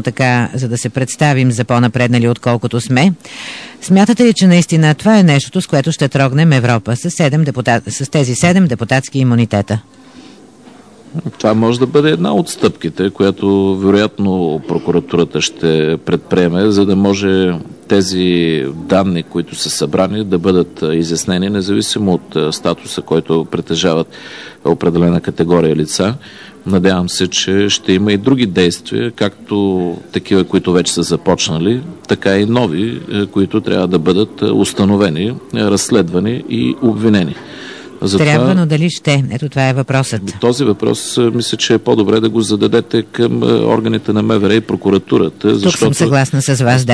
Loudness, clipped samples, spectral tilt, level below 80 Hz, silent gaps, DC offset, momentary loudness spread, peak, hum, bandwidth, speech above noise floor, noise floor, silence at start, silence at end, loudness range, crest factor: -13 LUFS; under 0.1%; -5.5 dB/octave; -46 dBFS; none; 0.2%; 7 LU; 0 dBFS; none; 11 kHz; 27 dB; -39 dBFS; 0 s; 0 s; 4 LU; 12 dB